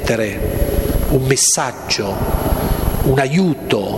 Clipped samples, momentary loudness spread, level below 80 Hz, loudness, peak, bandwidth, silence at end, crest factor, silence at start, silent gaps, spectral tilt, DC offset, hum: under 0.1%; 7 LU; -24 dBFS; -17 LUFS; 0 dBFS; 16.5 kHz; 0 s; 16 dB; 0 s; none; -4 dB/octave; 0.2%; none